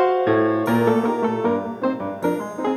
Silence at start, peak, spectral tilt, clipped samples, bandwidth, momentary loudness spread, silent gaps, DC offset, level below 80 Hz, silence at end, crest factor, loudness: 0 s; -4 dBFS; -7 dB/octave; under 0.1%; 13.5 kHz; 6 LU; none; under 0.1%; -64 dBFS; 0 s; 16 dB; -21 LUFS